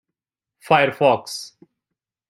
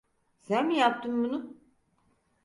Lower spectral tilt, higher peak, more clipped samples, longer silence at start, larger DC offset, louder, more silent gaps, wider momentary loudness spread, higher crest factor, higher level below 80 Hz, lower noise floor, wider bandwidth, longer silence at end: about the same, -4.5 dB/octave vs -5 dB/octave; first, -2 dBFS vs -10 dBFS; neither; first, 0.7 s vs 0.5 s; neither; first, -18 LUFS vs -28 LUFS; neither; first, 16 LU vs 11 LU; about the same, 20 dB vs 20 dB; first, -66 dBFS vs -74 dBFS; first, -85 dBFS vs -70 dBFS; first, 16 kHz vs 11 kHz; about the same, 0.8 s vs 0.9 s